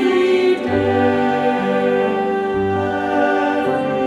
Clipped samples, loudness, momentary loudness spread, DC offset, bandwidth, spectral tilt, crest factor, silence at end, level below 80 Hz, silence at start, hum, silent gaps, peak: under 0.1%; -17 LUFS; 4 LU; under 0.1%; 11 kHz; -6.5 dB/octave; 12 dB; 0 s; -52 dBFS; 0 s; none; none; -4 dBFS